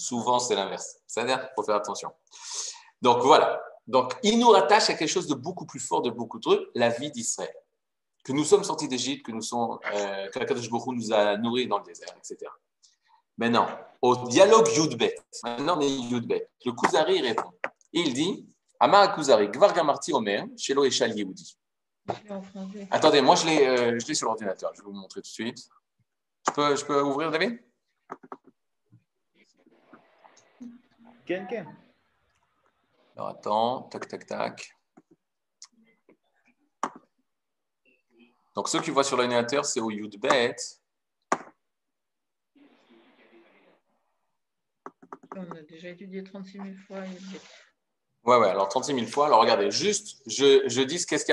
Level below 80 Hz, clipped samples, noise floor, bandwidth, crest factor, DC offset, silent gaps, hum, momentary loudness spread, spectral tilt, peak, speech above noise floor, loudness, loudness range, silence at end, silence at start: -76 dBFS; under 0.1%; -88 dBFS; 12 kHz; 24 dB; under 0.1%; none; none; 21 LU; -3.5 dB/octave; -4 dBFS; 63 dB; -25 LUFS; 18 LU; 0 s; 0 s